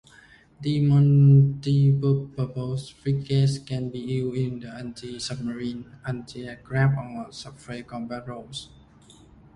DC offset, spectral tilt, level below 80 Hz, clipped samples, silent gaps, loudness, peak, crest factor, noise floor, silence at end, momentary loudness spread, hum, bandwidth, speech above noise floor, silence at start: under 0.1%; -7.5 dB/octave; -54 dBFS; under 0.1%; none; -24 LUFS; -8 dBFS; 16 dB; -53 dBFS; 0.9 s; 19 LU; none; 10.5 kHz; 30 dB; 0.6 s